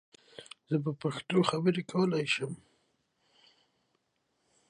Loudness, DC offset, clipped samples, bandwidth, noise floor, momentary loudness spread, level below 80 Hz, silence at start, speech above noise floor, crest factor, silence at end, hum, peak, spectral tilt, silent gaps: -31 LUFS; under 0.1%; under 0.1%; 11.5 kHz; -78 dBFS; 21 LU; -76 dBFS; 0.4 s; 48 dB; 22 dB; 2.15 s; none; -12 dBFS; -6 dB/octave; none